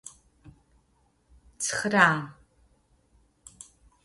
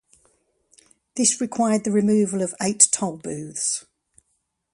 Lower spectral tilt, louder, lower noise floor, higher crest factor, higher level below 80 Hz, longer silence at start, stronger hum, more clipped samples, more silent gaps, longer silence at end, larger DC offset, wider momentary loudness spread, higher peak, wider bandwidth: about the same, -3.5 dB/octave vs -3.5 dB/octave; second, -24 LUFS vs -21 LUFS; second, -68 dBFS vs -73 dBFS; about the same, 26 dB vs 24 dB; about the same, -62 dBFS vs -66 dBFS; second, 0.05 s vs 1.15 s; neither; neither; neither; first, 1.75 s vs 0.95 s; neither; first, 28 LU vs 13 LU; second, -4 dBFS vs 0 dBFS; about the same, 11.5 kHz vs 11.5 kHz